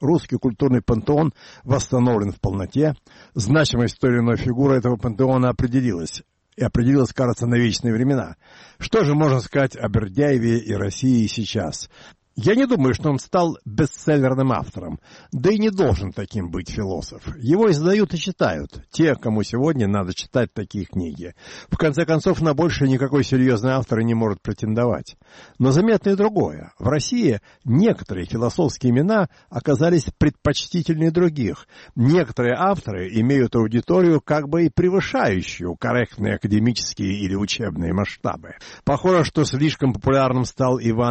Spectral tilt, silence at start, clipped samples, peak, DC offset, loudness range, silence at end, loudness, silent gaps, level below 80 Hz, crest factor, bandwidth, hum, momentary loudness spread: -6.5 dB/octave; 0 s; under 0.1%; -6 dBFS; under 0.1%; 2 LU; 0 s; -20 LUFS; none; -42 dBFS; 14 dB; 8.4 kHz; none; 10 LU